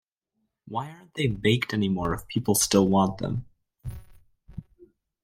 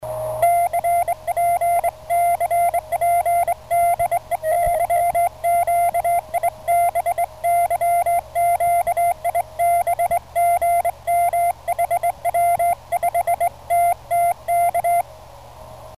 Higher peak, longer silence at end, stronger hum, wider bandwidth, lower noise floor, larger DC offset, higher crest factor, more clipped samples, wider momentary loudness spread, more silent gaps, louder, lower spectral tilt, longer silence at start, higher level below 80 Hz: about the same, -6 dBFS vs -8 dBFS; first, 0.65 s vs 0 s; neither; first, 16 kHz vs 14.5 kHz; first, -78 dBFS vs -41 dBFS; second, under 0.1% vs 0.3%; first, 22 dB vs 12 dB; neither; first, 24 LU vs 4 LU; neither; second, -25 LUFS vs -20 LUFS; first, -4.5 dB/octave vs -3 dB/octave; first, 0.65 s vs 0 s; about the same, -50 dBFS vs -46 dBFS